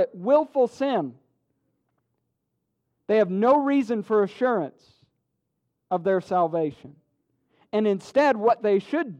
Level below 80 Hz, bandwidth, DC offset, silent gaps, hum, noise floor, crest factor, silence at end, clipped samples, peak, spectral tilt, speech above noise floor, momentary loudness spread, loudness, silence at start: -74 dBFS; 9.6 kHz; under 0.1%; none; none; -78 dBFS; 16 dB; 0.05 s; under 0.1%; -8 dBFS; -7 dB/octave; 55 dB; 9 LU; -23 LUFS; 0 s